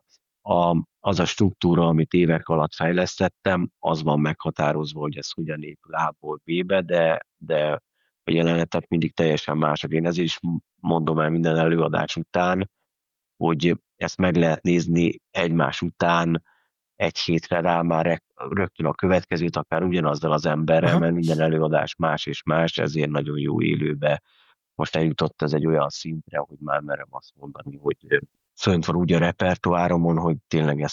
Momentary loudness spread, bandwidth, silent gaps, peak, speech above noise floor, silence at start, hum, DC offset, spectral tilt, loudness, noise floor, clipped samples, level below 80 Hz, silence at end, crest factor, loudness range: 9 LU; 7.4 kHz; none; -4 dBFS; 62 dB; 0.45 s; none; under 0.1%; -6.5 dB/octave; -23 LUFS; -84 dBFS; under 0.1%; -54 dBFS; 0 s; 20 dB; 4 LU